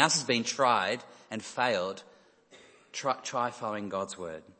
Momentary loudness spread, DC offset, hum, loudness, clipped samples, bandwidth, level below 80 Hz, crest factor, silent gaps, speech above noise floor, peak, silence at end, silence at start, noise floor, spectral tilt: 15 LU; under 0.1%; none; -31 LUFS; under 0.1%; 8.8 kHz; -76 dBFS; 24 dB; none; 28 dB; -6 dBFS; 0.1 s; 0 s; -58 dBFS; -2.5 dB/octave